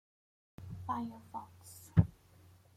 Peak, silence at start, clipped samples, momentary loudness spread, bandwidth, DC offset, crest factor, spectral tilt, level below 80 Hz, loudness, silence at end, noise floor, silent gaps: -12 dBFS; 0.6 s; under 0.1%; 21 LU; 15.5 kHz; under 0.1%; 26 dB; -8 dB/octave; -56 dBFS; -36 LUFS; 0.65 s; -62 dBFS; none